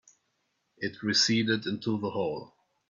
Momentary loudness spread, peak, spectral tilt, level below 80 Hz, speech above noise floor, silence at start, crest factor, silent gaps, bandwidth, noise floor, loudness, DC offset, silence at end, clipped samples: 13 LU; -12 dBFS; -3.5 dB/octave; -72 dBFS; 48 dB; 0.8 s; 20 dB; none; 7.6 kHz; -77 dBFS; -28 LUFS; under 0.1%; 0.45 s; under 0.1%